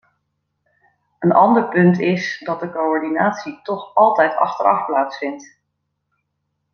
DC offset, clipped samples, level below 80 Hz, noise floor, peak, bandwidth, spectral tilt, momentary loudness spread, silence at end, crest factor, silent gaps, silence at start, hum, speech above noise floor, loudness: under 0.1%; under 0.1%; -68 dBFS; -74 dBFS; -2 dBFS; 6.8 kHz; -7.5 dB/octave; 13 LU; 1.3 s; 18 dB; none; 1.2 s; none; 57 dB; -17 LUFS